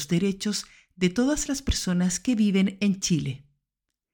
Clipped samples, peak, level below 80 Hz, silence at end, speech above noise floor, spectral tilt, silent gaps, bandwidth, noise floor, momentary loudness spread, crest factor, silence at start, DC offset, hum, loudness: under 0.1%; -10 dBFS; -42 dBFS; 0.75 s; 60 dB; -5 dB/octave; none; 17.5 kHz; -85 dBFS; 8 LU; 16 dB; 0 s; under 0.1%; none; -25 LUFS